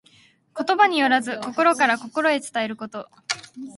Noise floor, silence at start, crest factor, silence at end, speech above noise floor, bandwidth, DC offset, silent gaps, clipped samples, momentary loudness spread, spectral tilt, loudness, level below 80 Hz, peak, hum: -56 dBFS; 0.55 s; 20 dB; 0.05 s; 35 dB; 11.5 kHz; under 0.1%; none; under 0.1%; 15 LU; -2.5 dB/octave; -21 LUFS; -72 dBFS; -2 dBFS; none